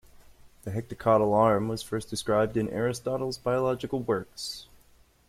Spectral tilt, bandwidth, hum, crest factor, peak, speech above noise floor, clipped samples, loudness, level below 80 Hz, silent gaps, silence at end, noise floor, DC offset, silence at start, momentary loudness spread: -6 dB/octave; 15.5 kHz; none; 18 dB; -10 dBFS; 33 dB; under 0.1%; -28 LUFS; -56 dBFS; none; 0.65 s; -60 dBFS; under 0.1%; 0.45 s; 13 LU